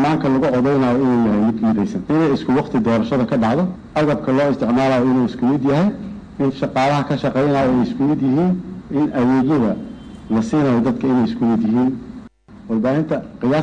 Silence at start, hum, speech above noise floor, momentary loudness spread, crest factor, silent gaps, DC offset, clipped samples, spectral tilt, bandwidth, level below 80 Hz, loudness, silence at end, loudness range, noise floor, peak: 0 s; none; 23 dB; 6 LU; 6 dB; none; under 0.1%; under 0.1%; -8 dB/octave; 9 kHz; -46 dBFS; -18 LUFS; 0 s; 2 LU; -40 dBFS; -10 dBFS